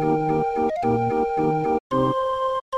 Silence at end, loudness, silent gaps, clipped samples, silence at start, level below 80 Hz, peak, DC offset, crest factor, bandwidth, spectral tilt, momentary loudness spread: 0 s; -22 LUFS; 1.80-1.90 s, 2.61-2.72 s; under 0.1%; 0 s; -48 dBFS; -8 dBFS; under 0.1%; 14 dB; 10 kHz; -8 dB/octave; 2 LU